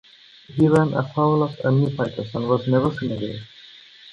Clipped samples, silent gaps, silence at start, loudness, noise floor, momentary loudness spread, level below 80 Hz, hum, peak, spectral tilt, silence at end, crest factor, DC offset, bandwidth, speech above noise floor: under 0.1%; none; 0.5 s; -21 LUFS; -46 dBFS; 13 LU; -54 dBFS; none; -4 dBFS; -8.5 dB/octave; 0 s; 18 dB; under 0.1%; 11 kHz; 26 dB